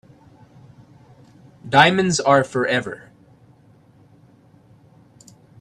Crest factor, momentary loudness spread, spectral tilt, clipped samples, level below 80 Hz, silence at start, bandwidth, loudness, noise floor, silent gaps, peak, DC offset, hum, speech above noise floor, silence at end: 22 dB; 22 LU; -4 dB/octave; under 0.1%; -60 dBFS; 1.65 s; 12.5 kHz; -17 LUFS; -52 dBFS; none; 0 dBFS; under 0.1%; none; 35 dB; 2.65 s